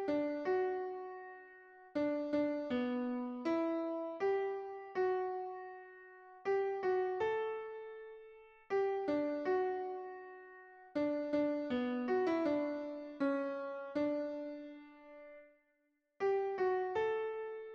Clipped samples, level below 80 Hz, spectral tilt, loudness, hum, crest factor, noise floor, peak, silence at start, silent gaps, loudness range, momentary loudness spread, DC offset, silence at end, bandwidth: under 0.1%; -78 dBFS; -6.5 dB/octave; -38 LUFS; none; 14 dB; -80 dBFS; -24 dBFS; 0 s; none; 3 LU; 18 LU; under 0.1%; 0 s; 6.6 kHz